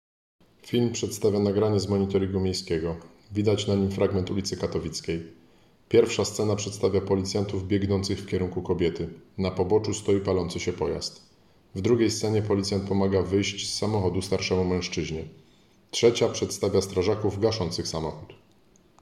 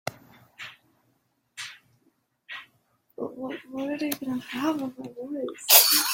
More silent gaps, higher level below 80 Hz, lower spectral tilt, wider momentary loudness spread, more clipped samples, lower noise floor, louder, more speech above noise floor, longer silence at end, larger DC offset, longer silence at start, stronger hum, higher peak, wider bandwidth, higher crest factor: neither; first, -56 dBFS vs -76 dBFS; first, -5.5 dB/octave vs -0.5 dB/octave; second, 9 LU vs 27 LU; neither; second, -60 dBFS vs -71 dBFS; second, -26 LUFS vs -23 LUFS; second, 34 dB vs 46 dB; first, 0.65 s vs 0 s; neither; first, 0.65 s vs 0.05 s; neither; second, -8 dBFS vs 0 dBFS; second, 14.5 kHz vs 16.5 kHz; second, 18 dB vs 28 dB